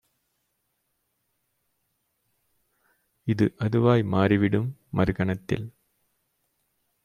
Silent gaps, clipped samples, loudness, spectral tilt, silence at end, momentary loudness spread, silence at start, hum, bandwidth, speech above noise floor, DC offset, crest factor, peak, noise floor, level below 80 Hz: none; under 0.1%; -25 LUFS; -8.5 dB/octave; 1.35 s; 10 LU; 3.25 s; none; 9.6 kHz; 53 dB; under 0.1%; 22 dB; -6 dBFS; -76 dBFS; -54 dBFS